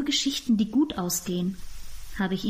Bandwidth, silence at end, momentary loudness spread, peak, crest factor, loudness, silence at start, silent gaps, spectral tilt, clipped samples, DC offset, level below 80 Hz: 15.5 kHz; 0 s; 18 LU; -14 dBFS; 14 dB; -26 LUFS; 0 s; none; -4 dB/octave; under 0.1%; under 0.1%; -46 dBFS